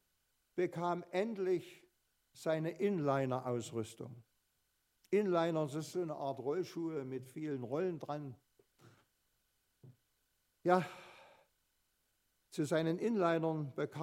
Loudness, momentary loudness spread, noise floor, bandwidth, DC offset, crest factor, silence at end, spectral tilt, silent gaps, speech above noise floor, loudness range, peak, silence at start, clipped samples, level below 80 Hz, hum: -38 LUFS; 12 LU; -81 dBFS; 15.5 kHz; under 0.1%; 24 dB; 0 s; -6.5 dB/octave; none; 44 dB; 6 LU; -16 dBFS; 0.55 s; under 0.1%; -84 dBFS; none